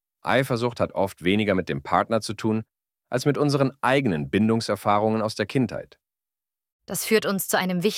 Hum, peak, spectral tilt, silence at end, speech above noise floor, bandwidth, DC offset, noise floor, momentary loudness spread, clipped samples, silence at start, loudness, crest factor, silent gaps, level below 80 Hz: none; -6 dBFS; -5 dB/octave; 0 s; over 67 dB; 17 kHz; under 0.1%; under -90 dBFS; 5 LU; under 0.1%; 0.25 s; -24 LUFS; 18 dB; 6.72-6.79 s; -58 dBFS